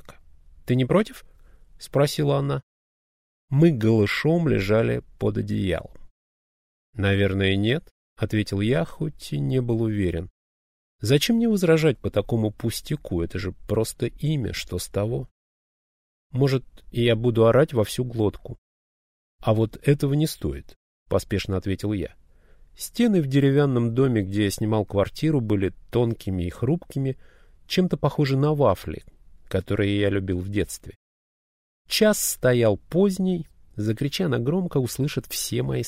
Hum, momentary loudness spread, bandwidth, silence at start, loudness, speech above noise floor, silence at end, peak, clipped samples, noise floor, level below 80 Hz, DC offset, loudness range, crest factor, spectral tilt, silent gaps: none; 11 LU; 16 kHz; 0.1 s; -24 LUFS; 29 dB; 0 s; -6 dBFS; under 0.1%; -52 dBFS; -46 dBFS; under 0.1%; 4 LU; 18 dB; -6 dB/octave; 2.63-3.48 s, 6.11-6.93 s, 7.91-8.16 s, 10.30-10.99 s, 15.31-16.30 s, 18.58-19.39 s, 20.76-21.06 s, 30.96-31.85 s